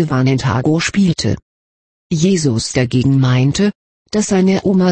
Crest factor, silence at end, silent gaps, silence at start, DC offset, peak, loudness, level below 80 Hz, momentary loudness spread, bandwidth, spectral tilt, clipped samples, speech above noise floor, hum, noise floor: 12 dB; 0 s; 1.42-2.10 s, 3.75-4.05 s; 0 s; under 0.1%; -2 dBFS; -15 LUFS; -42 dBFS; 6 LU; 8.8 kHz; -6 dB/octave; under 0.1%; over 77 dB; none; under -90 dBFS